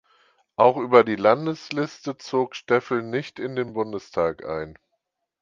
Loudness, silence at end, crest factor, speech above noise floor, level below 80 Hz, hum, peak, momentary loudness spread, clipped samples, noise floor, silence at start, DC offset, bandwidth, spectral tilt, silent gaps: -23 LUFS; 0.7 s; 22 dB; 55 dB; -60 dBFS; none; 0 dBFS; 14 LU; under 0.1%; -77 dBFS; 0.6 s; under 0.1%; 7.4 kHz; -6 dB/octave; none